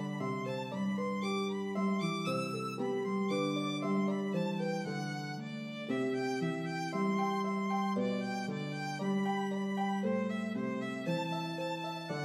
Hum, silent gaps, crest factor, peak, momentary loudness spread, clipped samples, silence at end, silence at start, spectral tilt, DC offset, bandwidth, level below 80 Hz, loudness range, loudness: none; none; 14 dB; -22 dBFS; 5 LU; under 0.1%; 0 s; 0 s; -6 dB/octave; under 0.1%; 12.5 kHz; -84 dBFS; 1 LU; -35 LUFS